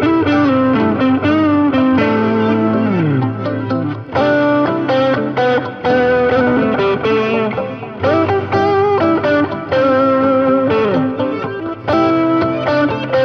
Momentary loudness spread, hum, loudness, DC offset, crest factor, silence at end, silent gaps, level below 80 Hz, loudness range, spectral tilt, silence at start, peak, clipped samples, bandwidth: 6 LU; none; -14 LUFS; under 0.1%; 12 dB; 0 s; none; -48 dBFS; 1 LU; -8 dB/octave; 0 s; 0 dBFS; under 0.1%; 6.6 kHz